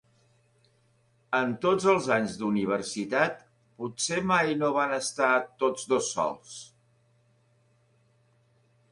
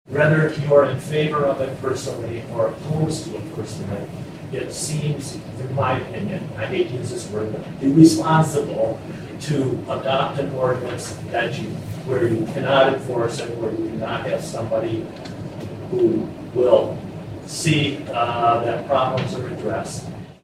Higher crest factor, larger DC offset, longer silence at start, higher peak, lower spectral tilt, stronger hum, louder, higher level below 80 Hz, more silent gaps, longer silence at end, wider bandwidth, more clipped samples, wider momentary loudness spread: about the same, 20 dB vs 20 dB; neither; first, 1.3 s vs 0.1 s; second, -10 dBFS vs 0 dBFS; second, -4 dB/octave vs -6 dB/octave; neither; second, -27 LUFS vs -21 LUFS; second, -68 dBFS vs -52 dBFS; neither; first, 2.25 s vs 0.1 s; second, 11.5 kHz vs 15 kHz; neither; about the same, 12 LU vs 14 LU